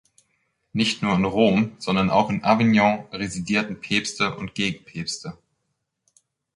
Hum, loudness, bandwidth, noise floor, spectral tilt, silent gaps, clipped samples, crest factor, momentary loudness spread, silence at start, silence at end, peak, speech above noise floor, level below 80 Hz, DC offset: none; -22 LUFS; 11 kHz; -77 dBFS; -5 dB/octave; none; under 0.1%; 20 dB; 12 LU; 0.75 s; 1.25 s; -4 dBFS; 55 dB; -54 dBFS; under 0.1%